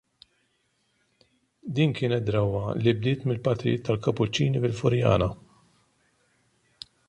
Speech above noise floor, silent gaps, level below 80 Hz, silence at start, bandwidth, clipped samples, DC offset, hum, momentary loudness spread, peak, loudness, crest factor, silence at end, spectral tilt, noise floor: 47 dB; none; -50 dBFS; 1.65 s; 9.4 kHz; under 0.1%; under 0.1%; none; 9 LU; -8 dBFS; -26 LUFS; 20 dB; 1.75 s; -7 dB/octave; -71 dBFS